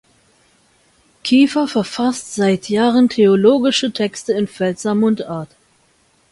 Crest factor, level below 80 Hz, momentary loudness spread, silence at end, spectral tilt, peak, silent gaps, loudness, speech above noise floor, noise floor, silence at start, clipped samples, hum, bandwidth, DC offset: 16 dB; -58 dBFS; 9 LU; 0.85 s; -5 dB/octave; -2 dBFS; none; -16 LUFS; 42 dB; -57 dBFS; 1.25 s; under 0.1%; none; 11.5 kHz; under 0.1%